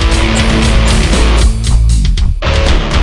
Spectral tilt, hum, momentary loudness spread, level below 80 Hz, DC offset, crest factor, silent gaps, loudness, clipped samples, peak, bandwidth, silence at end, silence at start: -5 dB/octave; none; 3 LU; -10 dBFS; under 0.1%; 8 dB; none; -11 LUFS; under 0.1%; 0 dBFS; 11.5 kHz; 0 s; 0 s